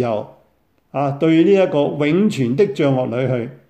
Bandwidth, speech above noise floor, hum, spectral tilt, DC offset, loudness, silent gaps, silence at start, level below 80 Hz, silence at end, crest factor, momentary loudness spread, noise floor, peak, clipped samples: 9 kHz; 44 dB; none; -7.5 dB/octave; under 0.1%; -17 LUFS; none; 0 s; -62 dBFS; 0.15 s; 14 dB; 9 LU; -61 dBFS; -4 dBFS; under 0.1%